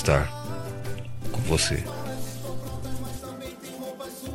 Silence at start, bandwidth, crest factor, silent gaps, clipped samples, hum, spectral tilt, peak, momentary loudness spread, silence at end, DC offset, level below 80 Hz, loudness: 0 s; 16.5 kHz; 22 dB; none; under 0.1%; none; -4.5 dB/octave; -6 dBFS; 14 LU; 0 s; under 0.1%; -42 dBFS; -31 LUFS